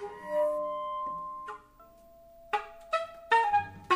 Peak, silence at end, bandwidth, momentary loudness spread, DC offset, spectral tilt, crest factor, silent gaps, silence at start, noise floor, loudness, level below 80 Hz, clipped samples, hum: -12 dBFS; 0 s; 15.5 kHz; 15 LU; under 0.1%; -4 dB/octave; 20 dB; none; 0 s; -56 dBFS; -31 LUFS; -64 dBFS; under 0.1%; none